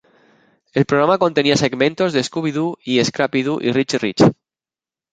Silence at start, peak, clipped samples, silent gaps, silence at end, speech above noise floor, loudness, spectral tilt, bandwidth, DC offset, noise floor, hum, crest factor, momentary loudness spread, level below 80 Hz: 0.75 s; 0 dBFS; under 0.1%; none; 0.8 s; over 73 dB; -17 LUFS; -5 dB/octave; 9.4 kHz; under 0.1%; under -90 dBFS; none; 18 dB; 6 LU; -54 dBFS